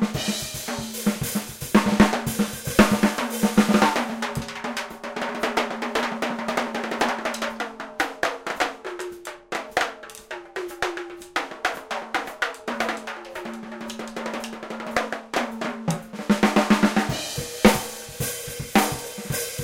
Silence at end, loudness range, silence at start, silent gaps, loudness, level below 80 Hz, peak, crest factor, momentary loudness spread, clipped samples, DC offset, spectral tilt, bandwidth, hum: 0 s; 9 LU; 0 s; none; -25 LUFS; -48 dBFS; -2 dBFS; 24 dB; 14 LU; under 0.1%; under 0.1%; -4 dB/octave; 17 kHz; none